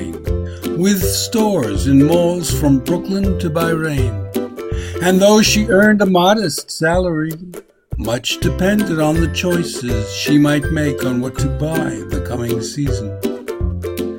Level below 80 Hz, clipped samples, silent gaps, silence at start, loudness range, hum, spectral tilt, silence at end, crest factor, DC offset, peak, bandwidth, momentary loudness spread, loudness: -30 dBFS; under 0.1%; none; 0 s; 4 LU; none; -5 dB/octave; 0 s; 16 dB; 0.1%; 0 dBFS; 16.5 kHz; 12 LU; -16 LUFS